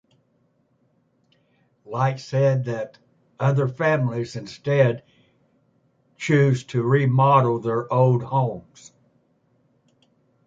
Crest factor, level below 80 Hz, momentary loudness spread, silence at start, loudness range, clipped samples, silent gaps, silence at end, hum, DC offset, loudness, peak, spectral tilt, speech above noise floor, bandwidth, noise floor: 18 dB; -64 dBFS; 14 LU; 1.9 s; 5 LU; under 0.1%; none; 1.85 s; none; under 0.1%; -21 LUFS; -4 dBFS; -7.5 dB/octave; 45 dB; 7.6 kHz; -66 dBFS